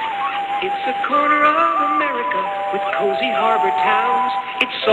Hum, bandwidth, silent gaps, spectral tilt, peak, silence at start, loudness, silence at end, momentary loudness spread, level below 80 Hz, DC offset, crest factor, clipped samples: none; 9.4 kHz; none; -4 dB/octave; 0 dBFS; 0 s; -18 LUFS; 0 s; 7 LU; -62 dBFS; under 0.1%; 18 dB; under 0.1%